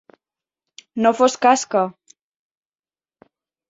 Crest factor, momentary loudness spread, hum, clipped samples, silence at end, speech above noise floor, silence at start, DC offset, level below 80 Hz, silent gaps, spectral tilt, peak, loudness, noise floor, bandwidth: 20 dB; 10 LU; none; under 0.1%; 1.8 s; over 73 dB; 0.95 s; under 0.1%; -68 dBFS; none; -3.5 dB/octave; -2 dBFS; -18 LUFS; under -90 dBFS; 8 kHz